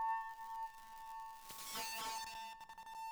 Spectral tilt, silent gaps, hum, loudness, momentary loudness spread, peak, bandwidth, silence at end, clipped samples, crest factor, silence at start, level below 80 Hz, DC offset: 0.5 dB/octave; none; none; -46 LUFS; 10 LU; -32 dBFS; over 20 kHz; 0 s; under 0.1%; 16 dB; 0 s; -74 dBFS; under 0.1%